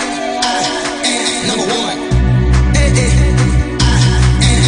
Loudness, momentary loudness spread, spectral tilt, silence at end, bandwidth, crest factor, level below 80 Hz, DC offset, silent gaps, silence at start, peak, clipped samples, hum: -13 LUFS; 5 LU; -4.5 dB/octave; 0 s; 10.5 kHz; 10 dB; -16 dBFS; under 0.1%; none; 0 s; -2 dBFS; under 0.1%; none